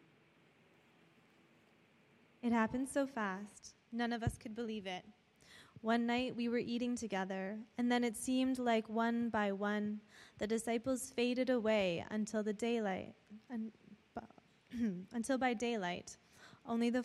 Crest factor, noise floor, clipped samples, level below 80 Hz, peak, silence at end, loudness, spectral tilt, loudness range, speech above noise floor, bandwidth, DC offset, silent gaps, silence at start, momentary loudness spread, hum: 18 dB; -69 dBFS; under 0.1%; -66 dBFS; -22 dBFS; 0 s; -38 LUFS; -5 dB/octave; 5 LU; 31 dB; 13 kHz; under 0.1%; none; 2.45 s; 15 LU; none